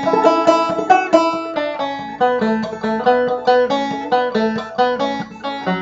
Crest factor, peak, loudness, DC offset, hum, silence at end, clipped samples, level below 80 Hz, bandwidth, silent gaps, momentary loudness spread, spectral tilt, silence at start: 16 dB; 0 dBFS; -17 LUFS; under 0.1%; none; 0 s; under 0.1%; -54 dBFS; 8 kHz; none; 9 LU; -5.5 dB/octave; 0 s